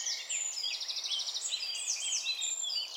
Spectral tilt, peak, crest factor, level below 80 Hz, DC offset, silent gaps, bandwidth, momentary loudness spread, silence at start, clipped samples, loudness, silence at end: 6 dB/octave; -20 dBFS; 16 dB; under -90 dBFS; under 0.1%; none; 16.5 kHz; 2 LU; 0 s; under 0.1%; -32 LUFS; 0 s